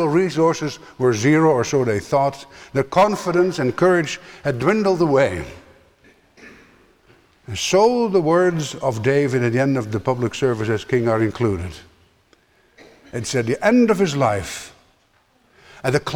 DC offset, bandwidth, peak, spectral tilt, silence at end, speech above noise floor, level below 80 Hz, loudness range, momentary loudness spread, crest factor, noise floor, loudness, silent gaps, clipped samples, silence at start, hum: under 0.1%; 16 kHz; -4 dBFS; -6 dB/octave; 0 s; 41 dB; -50 dBFS; 4 LU; 11 LU; 16 dB; -60 dBFS; -19 LUFS; none; under 0.1%; 0 s; none